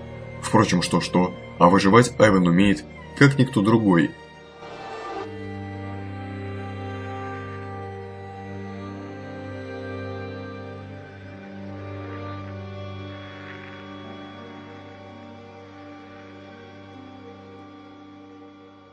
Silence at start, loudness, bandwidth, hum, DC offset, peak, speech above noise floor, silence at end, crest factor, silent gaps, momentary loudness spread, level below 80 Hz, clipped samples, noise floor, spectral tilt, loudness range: 0 s; -22 LUFS; 10.5 kHz; none; under 0.1%; 0 dBFS; 29 dB; 0.1 s; 24 dB; none; 25 LU; -52 dBFS; under 0.1%; -46 dBFS; -6 dB/octave; 23 LU